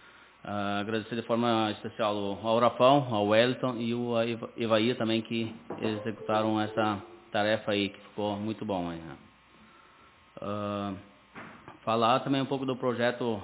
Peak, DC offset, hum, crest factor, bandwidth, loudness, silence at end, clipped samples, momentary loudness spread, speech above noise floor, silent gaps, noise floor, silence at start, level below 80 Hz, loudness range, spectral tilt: -8 dBFS; under 0.1%; none; 22 dB; 4 kHz; -29 LUFS; 0 s; under 0.1%; 13 LU; 29 dB; none; -58 dBFS; 0.05 s; -64 dBFS; 10 LU; -4 dB/octave